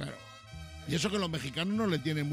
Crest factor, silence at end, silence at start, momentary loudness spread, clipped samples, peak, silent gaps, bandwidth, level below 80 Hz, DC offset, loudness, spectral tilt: 16 dB; 0 s; 0 s; 17 LU; under 0.1%; -16 dBFS; none; 15.5 kHz; -56 dBFS; under 0.1%; -32 LUFS; -5 dB/octave